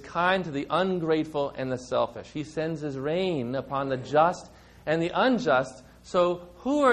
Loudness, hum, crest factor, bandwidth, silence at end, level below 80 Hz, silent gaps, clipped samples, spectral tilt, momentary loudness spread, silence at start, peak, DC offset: -27 LUFS; none; 18 dB; 10.5 kHz; 0 s; -58 dBFS; none; under 0.1%; -6 dB/octave; 9 LU; 0 s; -8 dBFS; under 0.1%